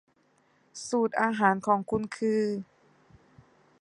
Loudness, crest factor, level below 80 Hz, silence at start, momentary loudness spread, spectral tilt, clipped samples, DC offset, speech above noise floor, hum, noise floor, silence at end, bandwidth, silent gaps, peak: -28 LUFS; 22 dB; -66 dBFS; 0.75 s; 16 LU; -5.5 dB/octave; under 0.1%; under 0.1%; 40 dB; none; -67 dBFS; 1.2 s; 11 kHz; none; -8 dBFS